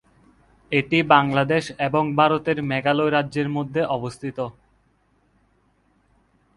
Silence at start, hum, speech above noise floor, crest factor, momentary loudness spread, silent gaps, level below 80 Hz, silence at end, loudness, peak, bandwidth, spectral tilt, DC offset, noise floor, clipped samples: 0.7 s; none; 42 dB; 22 dB; 13 LU; none; -58 dBFS; 2.05 s; -21 LUFS; 0 dBFS; 11.5 kHz; -6.5 dB/octave; under 0.1%; -63 dBFS; under 0.1%